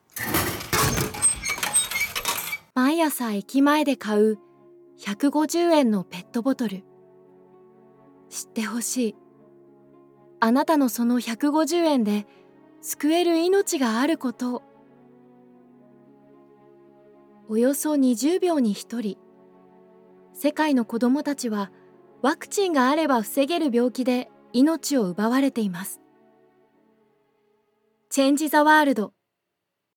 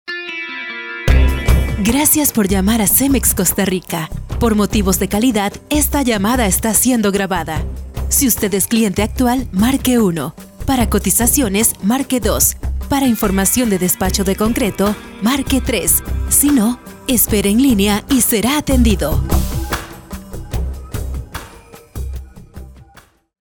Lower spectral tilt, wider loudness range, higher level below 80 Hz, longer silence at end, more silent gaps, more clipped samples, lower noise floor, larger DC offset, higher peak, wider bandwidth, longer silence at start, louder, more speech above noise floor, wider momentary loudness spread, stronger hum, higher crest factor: about the same, -3.5 dB/octave vs -4 dB/octave; about the same, 7 LU vs 5 LU; second, -56 dBFS vs -24 dBFS; first, 0.9 s vs 0.6 s; neither; neither; first, -81 dBFS vs -47 dBFS; second, under 0.1% vs 0.4%; second, -6 dBFS vs 0 dBFS; about the same, 19.5 kHz vs over 20 kHz; about the same, 0.15 s vs 0.05 s; second, -23 LUFS vs -15 LUFS; first, 59 dB vs 32 dB; about the same, 11 LU vs 13 LU; neither; about the same, 18 dB vs 16 dB